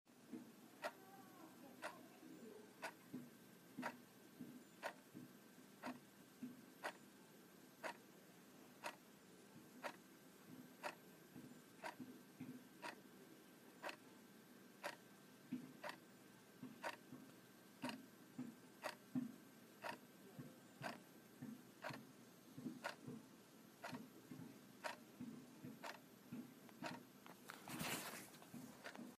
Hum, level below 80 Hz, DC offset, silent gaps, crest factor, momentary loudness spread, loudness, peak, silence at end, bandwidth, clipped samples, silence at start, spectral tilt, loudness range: none; under -90 dBFS; under 0.1%; none; 24 dB; 12 LU; -56 LUFS; -32 dBFS; 0 s; 15.5 kHz; under 0.1%; 0.05 s; -4 dB/octave; 4 LU